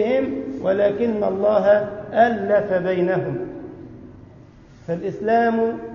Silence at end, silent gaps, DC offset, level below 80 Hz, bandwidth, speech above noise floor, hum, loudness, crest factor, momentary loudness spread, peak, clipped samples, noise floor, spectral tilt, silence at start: 0 s; none; under 0.1%; -54 dBFS; 6.6 kHz; 26 dB; none; -20 LUFS; 16 dB; 16 LU; -4 dBFS; under 0.1%; -45 dBFS; -8.5 dB/octave; 0 s